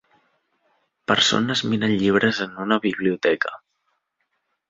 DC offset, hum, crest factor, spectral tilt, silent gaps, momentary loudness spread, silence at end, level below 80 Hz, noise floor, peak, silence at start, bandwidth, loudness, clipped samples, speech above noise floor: under 0.1%; none; 20 dB; -4 dB/octave; none; 8 LU; 1.15 s; -60 dBFS; -74 dBFS; -4 dBFS; 1.1 s; 7.8 kHz; -21 LUFS; under 0.1%; 53 dB